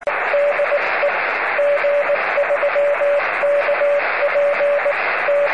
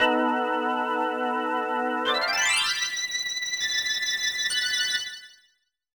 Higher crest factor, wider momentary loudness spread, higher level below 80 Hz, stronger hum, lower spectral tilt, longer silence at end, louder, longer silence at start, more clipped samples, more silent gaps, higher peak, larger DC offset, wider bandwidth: second, 10 dB vs 18 dB; second, 1 LU vs 5 LU; about the same, -68 dBFS vs -66 dBFS; neither; first, -3.5 dB/octave vs 0.5 dB/octave; second, 0 s vs 0.7 s; first, -17 LUFS vs -24 LUFS; about the same, 0 s vs 0 s; neither; neither; about the same, -8 dBFS vs -10 dBFS; first, 0.6% vs under 0.1%; second, 5.8 kHz vs 19.5 kHz